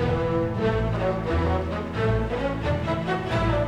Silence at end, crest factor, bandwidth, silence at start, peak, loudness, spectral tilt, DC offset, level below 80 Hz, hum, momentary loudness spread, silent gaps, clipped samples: 0 s; 12 dB; 9.8 kHz; 0 s; -12 dBFS; -25 LUFS; -8 dB/octave; under 0.1%; -34 dBFS; none; 2 LU; none; under 0.1%